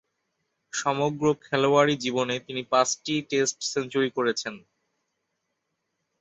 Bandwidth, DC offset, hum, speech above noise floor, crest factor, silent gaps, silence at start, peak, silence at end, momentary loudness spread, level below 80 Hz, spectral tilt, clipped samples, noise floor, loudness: 8.4 kHz; under 0.1%; none; 54 dB; 20 dB; none; 0.75 s; -6 dBFS; 1.65 s; 8 LU; -70 dBFS; -3.5 dB/octave; under 0.1%; -79 dBFS; -25 LUFS